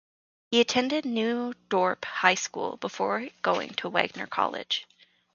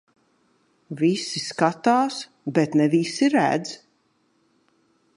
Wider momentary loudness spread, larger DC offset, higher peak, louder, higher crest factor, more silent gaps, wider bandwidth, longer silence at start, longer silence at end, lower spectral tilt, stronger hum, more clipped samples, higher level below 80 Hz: second, 7 LU vs 12 LU; neither; about the same, -2 dBFS vs -4 dBFS; second, -27 LUFS vs -22 LUFS; first, 26 dB vs 20 dB; neither; second, 7.4 kHz vs 11 kHz; second, 0.5 s vs 0.9 s; second, 0.5 s vs 1.4 s; second, -3 dB/octave vs -5 dB/octave; neither; neither; about the same, -72 dBFS vs -74 dBFS